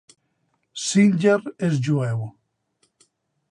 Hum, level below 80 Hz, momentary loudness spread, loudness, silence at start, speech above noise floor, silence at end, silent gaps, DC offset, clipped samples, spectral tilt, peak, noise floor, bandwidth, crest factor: none; -66 dBFS; 14 LU; -21 LUFS; 0.75 s; 51 dB; 1.2 s; none; under 0.1%; under 0.1%; -6 dB/octave; -6 dBFS; -71 dBFS; 11 kHz; 18 dB